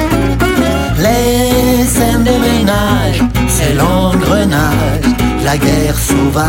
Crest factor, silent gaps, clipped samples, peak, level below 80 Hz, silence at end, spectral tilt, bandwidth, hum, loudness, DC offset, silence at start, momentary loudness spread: 10 dB; none; under 0.1%; 0 dBFS; -20 dBFS; 0 s; -5 dB/octave; 16.5 kHz; none; -11 LUFS; under 0.1%; 0 s; 2 LU